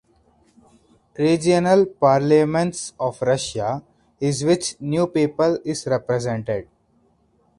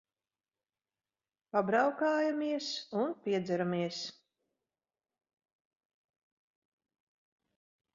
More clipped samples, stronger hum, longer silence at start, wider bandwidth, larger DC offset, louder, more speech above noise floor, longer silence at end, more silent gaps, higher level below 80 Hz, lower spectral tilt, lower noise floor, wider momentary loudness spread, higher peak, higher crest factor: neither; neither; second, 1.2 s vs 1.55 s; first, 11.5 kHz vs 7.4 kHz; neither; first, -20 LUFS vs -33 LUFS; second, 42 dB vs over 58 dB; second, 0.95 s vs 3.85 s; neither; first, -56 dBFS vs -82 dBFS; first, -5.5 dB/octave vs -4 dB/octave; second, -61 dBFS vs under -90 dBFS; first, 10 LU vs 7 LU; first, -4 dBFS vs -16 dBFS; about the same, 18 dB vs 22 dB